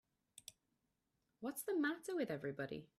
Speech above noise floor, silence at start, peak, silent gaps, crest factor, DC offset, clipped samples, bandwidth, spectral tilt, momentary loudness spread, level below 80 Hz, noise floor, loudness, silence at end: 44 dB; 0.35 s; -28 dBFS; none; 18 dB; under 0.1%; under 0.1%; 15.5 kHz; -4.5 dB/octave; 19 LU; -82 dBFS; -86 dBFS; -43 LUFS; 0.15 s